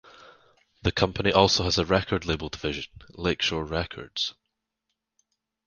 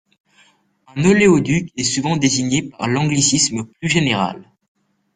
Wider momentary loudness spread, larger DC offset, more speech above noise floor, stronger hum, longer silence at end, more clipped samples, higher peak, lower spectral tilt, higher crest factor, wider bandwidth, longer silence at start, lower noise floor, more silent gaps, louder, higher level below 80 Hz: about the same, 11 LU vs 9 LU; neither; first, 56 dB vs 39 dB; neither; first, 1.35 s vs 0.75 s; neither; about the same, -2 dBFS vs -2 dBFS; about the same, -4.5 dB/octave vs -4 dB/octave; first, 26 dB vs 18 dB; about the same, 10 kHz vs 9.8 kHz; about the same, 0.85 s vs 0.95 s; first, -82 dBFS vs -56 dBFS; neither; second, -26 LUFS vs -17 LUFS; first, -44 dBFS vs -50 dBFS